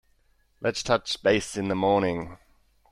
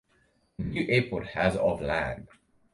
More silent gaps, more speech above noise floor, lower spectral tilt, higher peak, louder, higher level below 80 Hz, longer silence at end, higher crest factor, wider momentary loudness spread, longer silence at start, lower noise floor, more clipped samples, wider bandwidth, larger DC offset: neither; about the same, 40 dB vs 40 dB; second, -4.5 dB/octave vs -6.5 dB/octave; about the same, -8 dBFS vs -10 dBFS; about the same, -26 LUFS vs -28 LUFS; second, -54 dBFS vs -48 dBFS; about the same, 0.55 s vs 0.45 s; about the same, 20 dB vs 20 dB; second, 8 LU vs 12 LU; about the same, 0.6 s vs 0.6 s; about the same, -65 dBFS vs -68 dBFS; neither; about the same, 12.5 kHz vs 11.5 kHz; neither